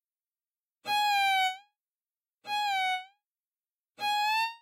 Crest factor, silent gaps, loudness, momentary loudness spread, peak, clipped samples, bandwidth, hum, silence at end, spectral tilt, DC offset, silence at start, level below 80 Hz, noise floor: 14 dB; 2.34-2.38 s, 3.47-3.52 s; -29 LUFS; 15 LU; -20 dBFS; under 0.1%; 16 kHz; none; 0.05 s; 1.5 dB/octave; under 0.1%; 0.85 s; -82 dBFS; under -90 dBFS